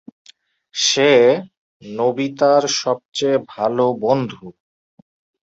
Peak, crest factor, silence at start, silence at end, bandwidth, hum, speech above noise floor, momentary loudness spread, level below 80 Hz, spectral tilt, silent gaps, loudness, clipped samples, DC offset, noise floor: -2 dBFS; 18 dB; 0.75 s; 0.9 s; 8 kHz; none; 34 dB; 12 LU; -64 dBFS; -3.5 dB/octave; 1.57-1.80 s, 3.05-3.12 s; -17 LUFS; under 0.1%; under 0.1%; -51 dBFS